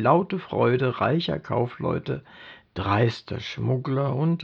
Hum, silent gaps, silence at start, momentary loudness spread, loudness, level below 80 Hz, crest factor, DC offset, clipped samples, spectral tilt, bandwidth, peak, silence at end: none; none; 0 s; 11 LU; -25 LUFS; -54 dBFS; 18 dB; under 0.1%; under 0.1%; -8 dB/octave; 7.2 kHz; -6 dBFS; 0 s